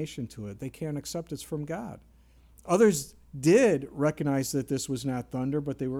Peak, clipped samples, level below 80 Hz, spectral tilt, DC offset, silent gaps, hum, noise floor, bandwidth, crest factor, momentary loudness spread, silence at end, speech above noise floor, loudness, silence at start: -10 dBFS; under 0.1%; -58 dBFS; -5.5 dB/octave; under 0.1%; none; none; -57 dBFS; 17.5 kHz; 20 dB; 16 LU; 0 s; 29 dB; -28 LUFS; 0 s